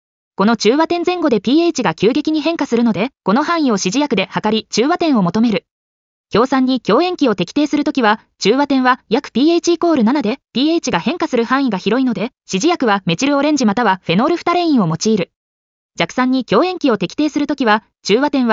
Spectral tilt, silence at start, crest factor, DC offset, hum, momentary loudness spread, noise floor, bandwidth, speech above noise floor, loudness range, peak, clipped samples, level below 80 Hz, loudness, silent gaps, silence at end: -4 dB/octave; 0.4 s; 14 dB; under 0.1%; none; 4 LU; under -90 dBFS; 7.6 kHz; over 75 dB; 2 LU; -2 dBFS; under 0.1%; -56 dBFS; -15 LUFS; 5.71-6.24 s, 15.36-15.89 s; 0 s